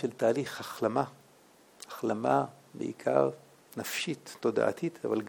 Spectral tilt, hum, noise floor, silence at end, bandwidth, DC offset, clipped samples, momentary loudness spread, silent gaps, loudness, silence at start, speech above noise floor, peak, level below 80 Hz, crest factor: -5 dB/octave; none; -60 dBFS; 0 s; 19.5 kHz; under 0.1%; under 0.1%; 12 LU; none; -32 LUFS; 0 s; 29 dB; -12 dBFS; -80 dBFS; 20 dB